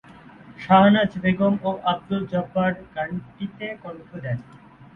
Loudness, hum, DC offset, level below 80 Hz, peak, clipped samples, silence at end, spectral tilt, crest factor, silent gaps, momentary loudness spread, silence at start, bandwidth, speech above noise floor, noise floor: -22 LUFS; none; under 0.1%; -54 dBFS; -2 dBFS; under 0.1%; 0.1 s; -9 dB/octave; 22 dB; none; 19 LU; 0.45 s; 4.6 kHz; 23 dB; -46 dBFS